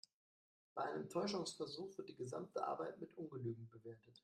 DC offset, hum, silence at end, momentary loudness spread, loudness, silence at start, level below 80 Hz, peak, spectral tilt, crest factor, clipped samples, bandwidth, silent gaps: under 0.1%; none; 0.05 s; 11 LU; -47 LUFS; 0.75 s; -88 dBFS; -28 dBFS; -5 dB/octave; 20 dB; under 0.1%; 13.5 kHz; none